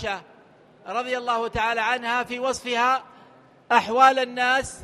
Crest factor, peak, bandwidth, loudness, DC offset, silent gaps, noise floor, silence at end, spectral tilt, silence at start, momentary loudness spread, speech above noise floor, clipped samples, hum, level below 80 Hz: 20 dB; -4 dBFS; 13 kHz; -22 LUFS; under 0.1%; none; -53 dBFS; 0 s; -2.5 dB/octave; 0 s; 11 LU; 30 dB; under 0.1%; none; -54 dBFS